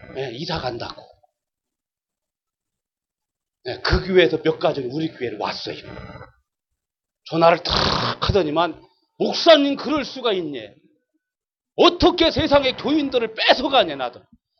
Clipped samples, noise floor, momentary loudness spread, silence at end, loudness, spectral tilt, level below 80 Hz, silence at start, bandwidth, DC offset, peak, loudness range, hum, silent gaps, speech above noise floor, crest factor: under 0.1%; -88 dBFS; 17 LU; 0.4 s; -19 LUFS; -5.5 dB/octave; -40 dBFS; 0.05 s; 6.8 kHz; under 0.1%; 0 dBFS; 10 LU; none; none; 68 dB; 20 dB